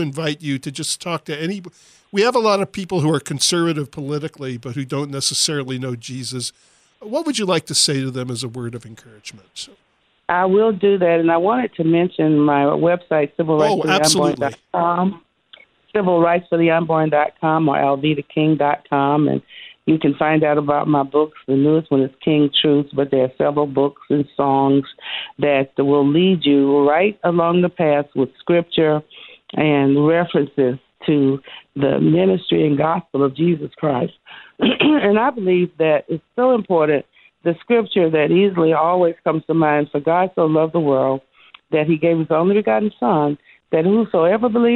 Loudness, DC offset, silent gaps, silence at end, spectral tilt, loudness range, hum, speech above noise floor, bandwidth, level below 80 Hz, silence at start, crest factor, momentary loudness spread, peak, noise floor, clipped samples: -18 LUFS; under 0.1%; none; 0 s; -5 dB/octave; 5 LU; none; 32 dB; 14.5 kHz; -60 dBFS; 0 s; 16 dB; 11 LU; -2 dBFS; -49 dBFS; under 0.1%